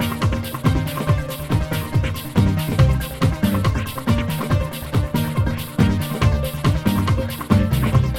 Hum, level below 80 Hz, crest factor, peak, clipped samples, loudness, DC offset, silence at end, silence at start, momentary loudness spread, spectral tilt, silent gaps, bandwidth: none; -28 dBFS; 18 dB; -2 dBFS; under 0.1%; -20 LUFS; under 0.1%; 0 s; 0 s; 4 LU; -6.5 dB/octave; none; 18 kHz